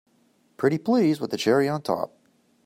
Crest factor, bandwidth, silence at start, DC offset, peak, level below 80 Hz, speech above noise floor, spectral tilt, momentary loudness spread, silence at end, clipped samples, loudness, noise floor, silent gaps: 16 dB; 16 kHz; 0.6 s; under 0.1%; -8 dBFS; -70 dBFS; 41 dB; -6 dB/octave; 7 LU; 0.6 s; under 0.1%; -24 LUFS; -64 dBFS; none